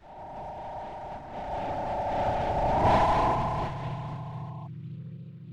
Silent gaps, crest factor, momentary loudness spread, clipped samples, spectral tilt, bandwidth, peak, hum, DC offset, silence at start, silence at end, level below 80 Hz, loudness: none; 18 dB; 18 LU; under 0.1%; -7 dB/octave; 11.5 kHz; -12 dBFS; none; under 0.1%; 0 s; 0 s; -42 dBFS; -29 LUFS